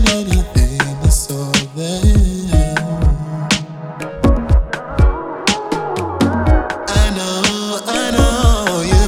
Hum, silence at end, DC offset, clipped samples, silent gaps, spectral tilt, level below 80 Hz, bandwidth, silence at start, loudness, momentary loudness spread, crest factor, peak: none; 0 s; under 0.1%; under 0.1%; none; -4.5 dB/octave; -18 dBFS; 15.5 kHz; 0 s; -16 LUFS; 6 LU; 14 dB; 0 dBFS